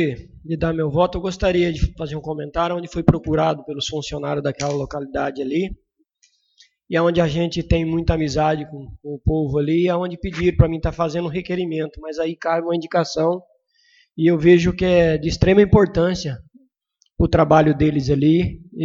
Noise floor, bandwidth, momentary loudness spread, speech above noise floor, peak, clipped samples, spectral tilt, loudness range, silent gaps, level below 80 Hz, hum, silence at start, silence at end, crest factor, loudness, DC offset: -66 dBFS; 7.8 kHz; 12 LU; 47 dB; 0 dBFS; under 0.1%; -7 dB/octave; 6 LU; none; -34 dBFS; none; 0 s; 0 s; 20 dB; -20 LUFS; under 0.1%